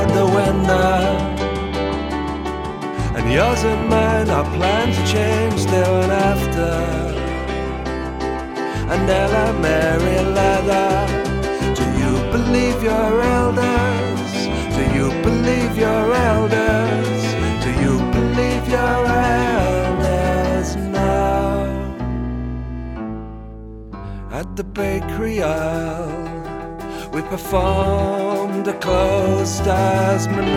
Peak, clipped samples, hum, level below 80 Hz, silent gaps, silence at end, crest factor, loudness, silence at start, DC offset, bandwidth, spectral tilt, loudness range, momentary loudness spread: -2 dBFS; under 0.1%; none; -28 dBFS; none; 0 s; 16 dB; -18 LUFS; 0 s; under 0.1%; 17 kHz; -6 dB/octave; 7 LU; 10 LU